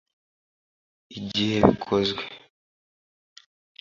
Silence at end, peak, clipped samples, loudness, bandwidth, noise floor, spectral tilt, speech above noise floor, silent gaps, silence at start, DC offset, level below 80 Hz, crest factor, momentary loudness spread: 1.4 s; 0 dBFS; under 0.1%; -23 LUFS; 7.4 kHz; under -90 dBFS; -6 dB/octave; over 67 dB; none; 1.1 s; under 0.1%; -50 dBFS; 28 dB; 18 LU